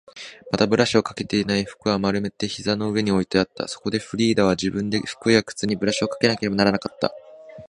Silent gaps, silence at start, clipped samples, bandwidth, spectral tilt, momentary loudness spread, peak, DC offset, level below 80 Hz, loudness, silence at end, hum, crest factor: none; 0.15 s; under 0.1%; 11 kHz; -5 dB/octave; 8 LU; -2 dBFS; under 0.1%; -52 dBFS; -22 LUFS; 0 s; none; 22 dB